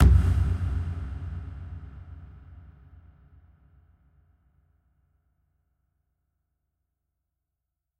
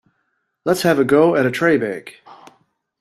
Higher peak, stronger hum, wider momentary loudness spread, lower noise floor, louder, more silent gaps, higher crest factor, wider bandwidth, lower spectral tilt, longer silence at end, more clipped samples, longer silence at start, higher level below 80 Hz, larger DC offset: second, -6 dBFS vs -2 dBFS; neither; first, 26 LU vs 13 LU; first, -85 dBFS vs -70 dBFS; second, -28 LUFS vs -17 LUFS; neither; first, 24 dB vs 16 dB; second, 5.4 kHz vs 14.5 kHz; first, -8 dB/octave vs -5.5 dB/octave; first, 5.45 s vs 0.65 s; neither; second, 0 s vs 0.65 s; first, -32 dBFS vs -60 dBFS; neither